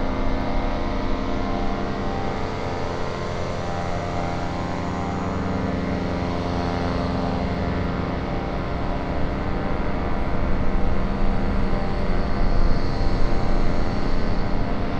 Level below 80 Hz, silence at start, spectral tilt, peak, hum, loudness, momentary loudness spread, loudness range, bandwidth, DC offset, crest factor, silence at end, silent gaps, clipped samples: -26 dBFS; 0 s; -7 dB/octave; -6 dBFS; none; -26 LUFS; 3 LU; 2 LU; 7.4 kHz; under 0.1%; 14 dB; 0 s; none; under 0.1%